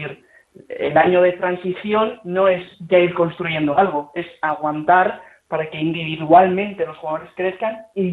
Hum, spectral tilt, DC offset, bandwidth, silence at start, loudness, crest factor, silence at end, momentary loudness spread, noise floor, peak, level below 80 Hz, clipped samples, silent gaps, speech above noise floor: none; -8.5 dB/octave; under 0.1%; 4.2 kHz; 0 s; -19 LUFS; 18 dB; 0 s; 12 LU; -48 dBFS; -2 dBFS; -60 dBFS; under 0.1%; none; 30 dB